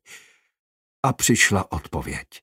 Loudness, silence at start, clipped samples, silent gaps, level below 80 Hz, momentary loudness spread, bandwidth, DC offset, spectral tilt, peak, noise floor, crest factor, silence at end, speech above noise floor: -21 LUFS; 0.1 s; under 0.1%; 0.59-1.03 s; -44 dBFS; 13 LU; 16 kHz; under 0.1%; -3.5 dB/octave; -2 dBFS; -49 dBFS; 22 dB; 0.05 s; 27 dB